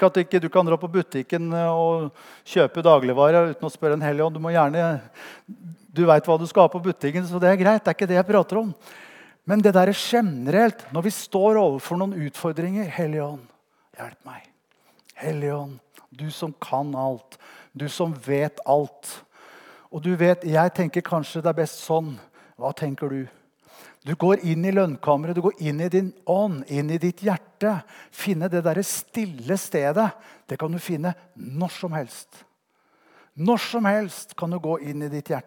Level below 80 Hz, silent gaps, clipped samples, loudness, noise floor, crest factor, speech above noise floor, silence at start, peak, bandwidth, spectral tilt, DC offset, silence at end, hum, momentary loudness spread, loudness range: -80 dBFS; none; under 0.1%; -23 LUFS; -66 dBFS; 22 dB; 44 dB; 0 s; -2 dBFS; 19 kHz; -6.5 dB/octave; under 0.1%; 0.05 s; none; 17 LU; 10 LU